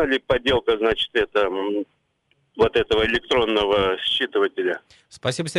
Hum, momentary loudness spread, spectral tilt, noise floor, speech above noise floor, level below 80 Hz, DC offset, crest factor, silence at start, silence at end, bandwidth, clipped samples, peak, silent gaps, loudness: none; 8 LU; -4.5 dB/octave; -67 dBFS; 46 dB; -44 dBFS; under 0.1%; 16 dB; 0 s; 0 s; 11.5 kHz; under 0.1%; -6 dBFS; none; -21 LUFS